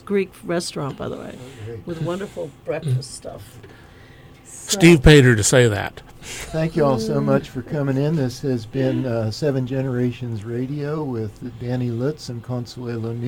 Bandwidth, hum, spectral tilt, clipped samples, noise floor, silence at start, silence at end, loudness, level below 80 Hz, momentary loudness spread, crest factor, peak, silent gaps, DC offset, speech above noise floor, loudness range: 16.5 kHz; none; -5.5 dB/octave; under 0.1%; -45 dBFS; 0.05 s; 0 s; -20 LUFS; -36 dBFS; 19 LU; 18 dB; -2 dBFS; none; under 0.1%; 24 dB; 12 LU